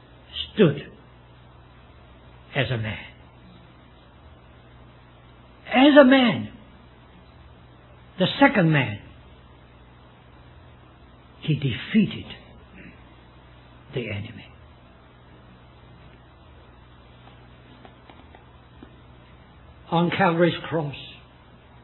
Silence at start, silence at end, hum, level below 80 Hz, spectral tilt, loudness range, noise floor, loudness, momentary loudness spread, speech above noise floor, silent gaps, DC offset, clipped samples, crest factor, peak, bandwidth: 0.35 s; 0.7 s; none; -54 dBFS; -10 dB/octave; 18 LU; -50 dBFS; -21 LUFS; 28 LU; 30 dB; none; under 0.1%; under 0.1%; 26 dB; 0 dBFS; 4.2 kHz